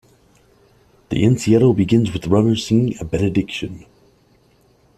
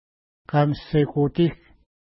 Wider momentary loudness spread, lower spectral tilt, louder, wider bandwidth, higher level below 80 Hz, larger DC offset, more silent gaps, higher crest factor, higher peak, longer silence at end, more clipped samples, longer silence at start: first, 12 LU vs 3 LU; second, -7 dB/octave vs -12 dB/octave; first, -17 LUFS vs -22 LUFS; first, 13 kHz vs 5.8 kHz; about the same, -44 dBFS vs -48 dBFS; neither; neither; about the same, 16 dB vs 18 dB; first, -2 dBFS vs -6 dBFS; first, 1.2 s vs 0.6 s; neither; first, 1.1 s vs 0.55 s